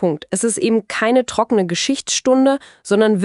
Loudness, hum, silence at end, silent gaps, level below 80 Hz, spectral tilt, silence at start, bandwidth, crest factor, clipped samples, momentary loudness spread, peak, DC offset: -17 LUFS; none; 0 s; none; -58 dBFS; -4 dB/octave; 0 s; 11.5 kHz; 14 dB; under 0.1%; 5 LU; -2 dBFS; under 0.1%